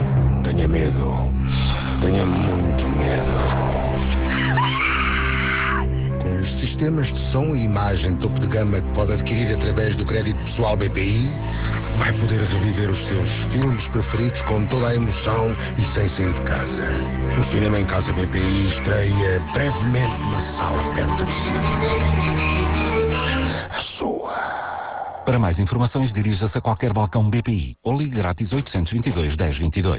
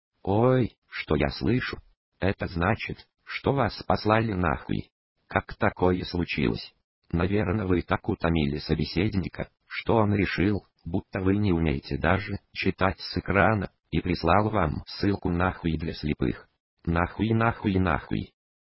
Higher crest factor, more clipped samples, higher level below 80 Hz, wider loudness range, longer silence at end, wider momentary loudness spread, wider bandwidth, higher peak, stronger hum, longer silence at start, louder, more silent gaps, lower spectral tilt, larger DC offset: second, 12 dB vs 22 dB; neither; first, -28 dBFS vs -40 dBFS; about the same, 2 LU vs 2 LU; second, 0 s vs 0.5 s; second, 4 LU vs 10 LU; second, 4 kHz vs 5.8 kHz; about the same, -8 dBFS vs -6 dBFS; neither; second, 0 s vs 0.25 s; first, -21 LUFS vs -27 LUFS; second, none vs 0.78-0.82 s, 1.97-2.12 s, 4.92-5.16 s, 6.84-7.02 s, 16.60-16.77 s; about the same, -11 dB/octave vs -11 dB/octave; neither